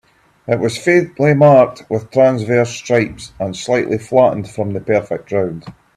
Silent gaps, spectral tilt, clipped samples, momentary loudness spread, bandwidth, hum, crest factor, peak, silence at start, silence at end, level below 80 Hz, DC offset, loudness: none; -6.5 dB/octave; under 0.1%; 13 LU; 12 kHz; none; 14 dB; 0 dBFS; 0.5 s; 0.25 s; -50 dBFS; under 0.1%; -15 LUFS